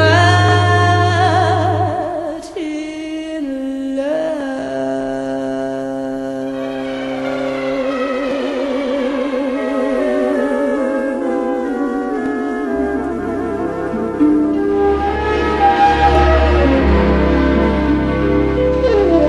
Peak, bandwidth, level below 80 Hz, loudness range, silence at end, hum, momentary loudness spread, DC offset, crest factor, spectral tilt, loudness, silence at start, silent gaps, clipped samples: 0 dBFS; 11 kHz; -26 dBFS; 8 LU; 0 s; none; 11 LU; under 0.1%; 16 dB; -7 dB/octave; -16 LUFS; 0 s; none; under 0.1%